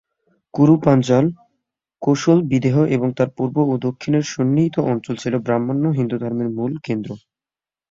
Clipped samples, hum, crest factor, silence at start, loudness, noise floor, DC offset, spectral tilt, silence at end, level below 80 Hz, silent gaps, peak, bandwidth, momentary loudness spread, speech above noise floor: under 0.1%; none; 18 dB; 0.55 s; -19 LUFS; under -90 dBFS; under 0.1%; -7.5 dB/octave; 0.75 s; -56 dBFS; none; -2 dBFS; 7.8 kHz; 10 LU; over 72 dB